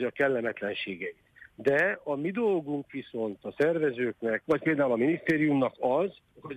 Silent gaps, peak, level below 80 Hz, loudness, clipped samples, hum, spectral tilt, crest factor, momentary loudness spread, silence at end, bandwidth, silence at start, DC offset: none; -12 dBFS; -68 dBFS; -29 LUFS; under 0.1%; none; -7.5 dB/octave; 16 dB; 10 LU; 0 s; 11.5 kHz; 0 s; under 0.1%